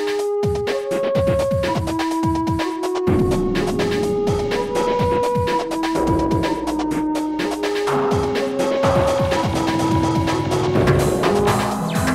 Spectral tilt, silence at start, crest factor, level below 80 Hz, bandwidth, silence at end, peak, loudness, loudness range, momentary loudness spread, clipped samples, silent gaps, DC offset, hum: -6 dB/octave; 0 s; 14 dB; -36 dBFS; 16 kHz; 0 s; -4 dBFS; -19 LUFS; 2 LU; 4 LU; under 0.1%; none; under 0.1%; none